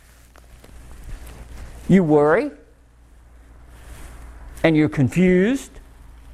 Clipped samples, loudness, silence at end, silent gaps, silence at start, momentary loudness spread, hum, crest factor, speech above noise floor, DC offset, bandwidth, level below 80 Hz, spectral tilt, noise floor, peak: under 0.1%; -18 LUFS; 0.55 s; none; 0.9 s; 26 LU; none; 20 dB; 34 dB; under 0.1%; 13.5 kHz; -42 dBFS; -7.5 dB/octave; -50 dBFS; -2 dBFS